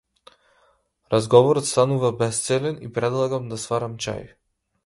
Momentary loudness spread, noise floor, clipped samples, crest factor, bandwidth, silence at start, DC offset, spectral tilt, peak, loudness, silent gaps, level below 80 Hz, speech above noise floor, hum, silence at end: 12 LU; -63 dBFS; under 0.1%; 22 dB; 11.5 kHz; 1.1 s; under 0.1%; -5 dB/octave; 0 dBFS; -22 LUFS; none; -58 dBFS; 42 dB; none; 0.6 s